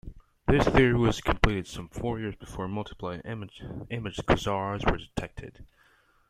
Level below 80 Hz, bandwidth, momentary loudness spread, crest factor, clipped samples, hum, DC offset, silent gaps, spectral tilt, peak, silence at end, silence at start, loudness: -38 dBFS; 14.5 kHz; 17 LU; 26 dB; under 0.1%; none; under 0.1%; none; -6.5 dB/octave; -4 dBFS; 0.65 s; 0.05 s; -28 LUFS